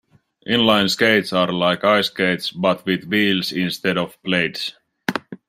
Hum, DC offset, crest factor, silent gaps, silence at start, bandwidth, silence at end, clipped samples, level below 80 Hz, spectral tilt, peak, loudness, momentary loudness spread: none; under 0.1%; 18 dB; none; 0.45 s; 16 kHz; 0.15 s; under 0.1%; -60 dBFS; -4.5 dB/octave; -2 dBFS; -19 LUFS; 11 LU